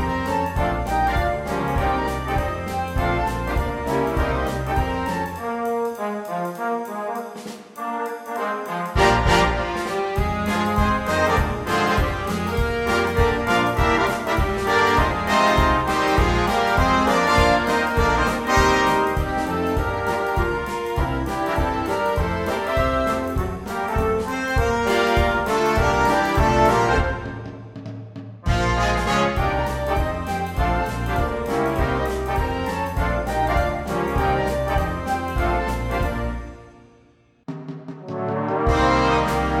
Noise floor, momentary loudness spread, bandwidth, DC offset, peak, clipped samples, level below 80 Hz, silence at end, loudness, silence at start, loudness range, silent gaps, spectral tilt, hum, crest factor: -56 dBFS; 10 LU; 16.5 kHz; under 0.1%; -4 dBFS; under 0.1%; -30 dBFS; 0 s; -21 LUFS; 0 s; 6 LU; none; -5.5 dB/octave; none; 18 dB